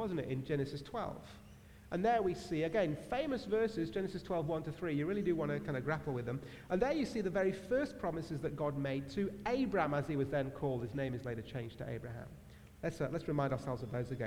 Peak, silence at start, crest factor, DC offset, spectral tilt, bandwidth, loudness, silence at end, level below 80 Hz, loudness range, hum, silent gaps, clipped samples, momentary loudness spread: -18 dBFS; 0 s; 18 dB; under 0.1%; -7.5 dB/octave; over 20 kHz; -38 LUFS; 0 s; -60 dBFS; 4 LU; none; none; under 0.1%; 9 LU